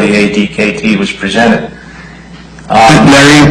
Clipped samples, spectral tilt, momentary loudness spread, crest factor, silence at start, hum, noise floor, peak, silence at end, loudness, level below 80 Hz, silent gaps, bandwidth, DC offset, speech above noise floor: 0.9%; -5 dB/octave; 9 LU; 8 dB; 0 s; none; -30 dBFS; 0 dBFS; 0 s; -7 LUFS; -32 dBFS; none; 15.5 kHz; under 0.1%; 24 dB